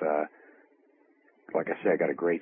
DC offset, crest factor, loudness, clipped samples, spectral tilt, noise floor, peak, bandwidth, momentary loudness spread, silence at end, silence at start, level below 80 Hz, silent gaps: under 0.1%; 18 dB; -30 LUFS; under 0.1%; -10.5 dB/octave; -64 dBFS; -14 dBFS; 3.6 kHz; 7 LU; 0 s; 0 s; -82 dBFS; none